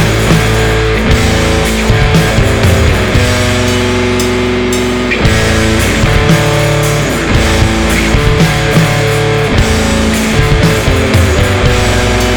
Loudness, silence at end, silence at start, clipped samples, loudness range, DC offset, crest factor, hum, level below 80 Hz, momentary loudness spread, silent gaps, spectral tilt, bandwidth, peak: -10 LUFS; 0 s; 0 s; under 0.1%; 1 LU; under 0.1%; 8 dB; none; -16 dBFS; 2 LU; none; -5 dB/octave; over 20 kHz; 0 dBFS